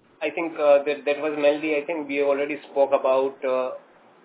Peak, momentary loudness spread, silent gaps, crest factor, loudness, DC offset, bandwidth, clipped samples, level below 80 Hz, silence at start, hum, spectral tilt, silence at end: -6 dBFS; 8 LU; none; 18 dB; -23 LUFS; under 0.1%; 4 kHz; under 0.1%; -84 dBFS; 0.2 s; none; -8 dB/octave; 0.45 s